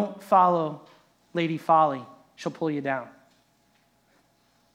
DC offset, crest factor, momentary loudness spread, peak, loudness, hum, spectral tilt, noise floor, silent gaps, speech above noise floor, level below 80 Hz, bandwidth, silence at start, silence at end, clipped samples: under 0.1%; 20 dB; 16 LU; -8 dBFS; -25 LUFS; none; -7 dB/octave; -66 dBFS; none; 41 dB; -80 dBFS; 15.5 kHz; 0 s; 1.65 s; under 0.1%